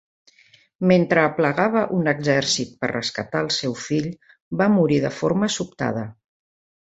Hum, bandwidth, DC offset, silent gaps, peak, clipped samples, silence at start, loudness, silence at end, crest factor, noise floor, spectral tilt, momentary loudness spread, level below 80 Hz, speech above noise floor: none; 8.2 kHz; under 0.1%; 4.41-4.51 s; -2 dBFS; under 0.1%; 0.8 s; -21 LUFS; 0.7 s; 20 dB; -56 dBFS; -5 dB/octave; 8 LU; -58 dBFS; 35 dB